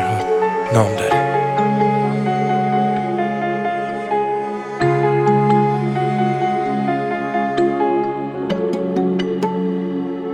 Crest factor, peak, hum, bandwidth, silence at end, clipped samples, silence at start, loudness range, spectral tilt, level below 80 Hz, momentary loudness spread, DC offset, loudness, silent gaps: 16 dB; -2 dBFS; none; 13 kHz; 0 s; under 0.1%; 0 s; 2 LU; -7.5 dB/octave; -54 dBFS; 6 LU; under 0.1%; -18 LUFS; none